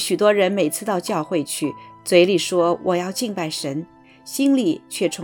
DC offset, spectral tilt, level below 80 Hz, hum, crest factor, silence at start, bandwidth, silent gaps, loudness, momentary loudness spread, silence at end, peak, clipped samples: under 0.1%; -4 dB/octave; -66 dBFS; none; 18 dB; 0 s; 19 kHz; none; -20 LUFS; 11 LU; 0 s; -2 dBFS; under 0.1%